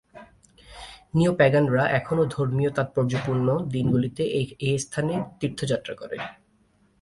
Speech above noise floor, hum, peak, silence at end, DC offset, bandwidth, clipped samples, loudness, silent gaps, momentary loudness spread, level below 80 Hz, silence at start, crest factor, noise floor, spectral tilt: 39 dB; none; -6 dBFS; 0.7 s; under 0.1%; 11.5 kHz; under 0.1%; -24 LUFS; none; 15 LU; -54 dBFS; 0.15 s; 20 dB; -63 dBFS; -6.5 dB/octave